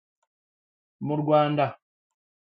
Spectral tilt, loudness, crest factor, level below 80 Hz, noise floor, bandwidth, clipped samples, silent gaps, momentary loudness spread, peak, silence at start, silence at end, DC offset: -10.5 dB/octave; -24 LUFS; 20 dB; -74 dBFS; under -90 dBFS; 5 kHz; under 0.1%; none; 10 LU; -8 dBFS; 1 s; 0.7 s; under 0.1%